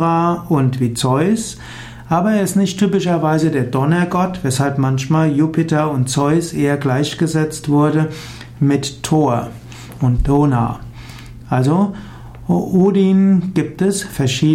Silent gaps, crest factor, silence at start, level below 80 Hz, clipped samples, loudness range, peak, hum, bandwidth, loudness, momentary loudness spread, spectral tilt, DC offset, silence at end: none; 12 dB; 0 s; -36 dBFS; under 0.1%; 2 LU; -4 dBFS; none; 15.5 kHz; -16 LUFS; 16 LU; -6.5 dB/octave; under 0.1%; 0 s